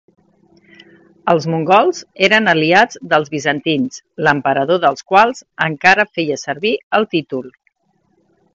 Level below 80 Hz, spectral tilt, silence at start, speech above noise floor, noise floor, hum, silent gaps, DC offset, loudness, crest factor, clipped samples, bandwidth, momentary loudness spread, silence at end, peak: -60 dBFS; -4.5 dB/octave; 1.25 s; 47 dB; -62 dBFS; none; 6.83-6.91 s; under 0.1%; -15 LUFS; 16 dB; under 0.1%; 8 kHz; 8 LU; 1.05 s; 0 dBFS